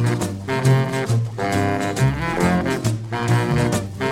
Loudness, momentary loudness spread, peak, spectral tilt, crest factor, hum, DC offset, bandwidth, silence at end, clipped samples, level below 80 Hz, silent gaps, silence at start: -20 LUFS; 5 LU; -4 dBFS; -6 dB/octave; 14 dB; none; under 0.1%; 15.5 kHz; 0 s; under 0.1%; -40 dBFS; none; 0 s